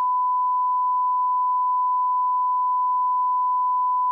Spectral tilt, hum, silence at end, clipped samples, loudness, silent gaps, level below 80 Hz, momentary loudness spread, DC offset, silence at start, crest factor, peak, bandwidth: -0.5 dB/octave; none; 0 s; under 0.1%; -21 LUFS; none; under -90 dBFS; 0 LU; under 0.1%; 0 s; 4 dB; -18 dBFS; 1.3 kHz